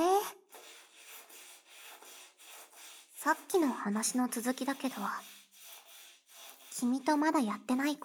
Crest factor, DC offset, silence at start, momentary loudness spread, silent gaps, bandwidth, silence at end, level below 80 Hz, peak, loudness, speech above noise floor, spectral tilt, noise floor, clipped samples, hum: 18 dB; under 0.1%; 0 s; 22 LU; none; over 20 kHz; 0 s; -88 dBFS; -16 dBFS; -33 LUFS; 25 dB; -3.5 dB/octave; -57 dBFS; under 0.1%; none